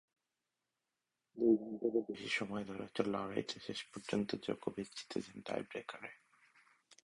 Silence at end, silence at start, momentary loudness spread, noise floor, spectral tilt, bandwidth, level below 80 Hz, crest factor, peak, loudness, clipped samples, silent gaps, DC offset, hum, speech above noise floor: 0.9 s; 1.35 s; 12 LU; -90 dBFS; -5 dB/octave; 11.5 kHz; -76 dBFS; 24 dB; -18 dBFS; -40 LUFS; under 0.1%; none; under 0.1%; none; 50 dB